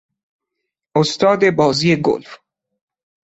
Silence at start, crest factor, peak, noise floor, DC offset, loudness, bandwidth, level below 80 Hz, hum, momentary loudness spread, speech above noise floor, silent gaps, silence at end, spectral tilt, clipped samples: 0.95 s; 16 dB; -2 dBFS; -79 dBFS; under 0.1%; -16 LUFS; 8.2 kHz; -56 dBFS; none; 7 LU; 64 dB; none; 0.9 s; -5.5 dB/octave; under 0.1%